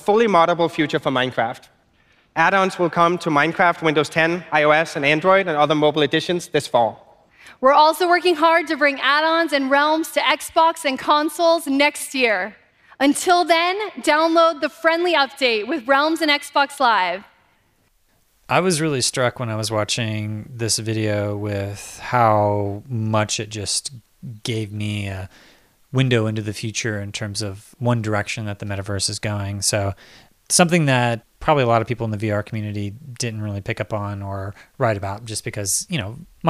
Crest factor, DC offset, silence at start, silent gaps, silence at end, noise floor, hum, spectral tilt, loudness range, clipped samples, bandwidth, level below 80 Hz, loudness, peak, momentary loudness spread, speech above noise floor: 20 dB; under 0.1%; 0 s; none; 0 s; -62 dBFS; none; -4 dB/octave; 7 LU; under 0.1%; 15.5 kHz; -56 dBFS; -19 LUFS; 0 dBFS; 12 LU; 42 dB